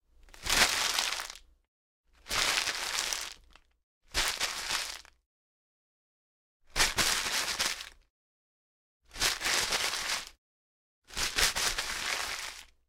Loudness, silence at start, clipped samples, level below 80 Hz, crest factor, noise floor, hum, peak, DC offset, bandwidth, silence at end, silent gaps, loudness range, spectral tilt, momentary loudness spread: -29 LUFS; 0.25 s; under 0.1%; -50 dBFS; 26 dB; -60 dBFS; none; -8 dBFS; under 0.1%; 17.5 kHz; 0.25 s; 1.68-2.04 s, 3.83-4.01 s, 5.26-6.60 s, 8.10-9.00 s, 10.38-11.02 s; 4 LU; 0.5 dB/octave; 15 LU